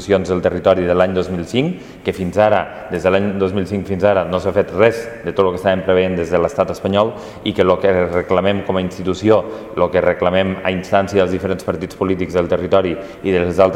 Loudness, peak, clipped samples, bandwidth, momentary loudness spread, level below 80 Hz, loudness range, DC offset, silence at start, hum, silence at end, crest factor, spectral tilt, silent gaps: -17 LUFS; 0 dBFS; under 0.1%; 14 kHz; 7 LU; -44 dBFS; 1 LU; under 0.1%; 0 s; none; 0 s; 16 dB; -6.5 dB/octave; none